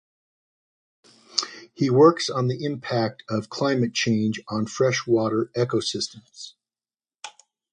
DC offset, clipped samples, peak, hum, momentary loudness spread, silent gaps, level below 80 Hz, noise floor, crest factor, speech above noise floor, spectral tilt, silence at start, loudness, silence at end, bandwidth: under 0.1%; under 0.1%; -2 dBFS; none; 23 LU; none; -64 dBFS; under -90 dBFS; 22 dB; over 67 dB; -5 dB/octave; 1.35 s; -23 LUFS; 0.45 s; 10 kHz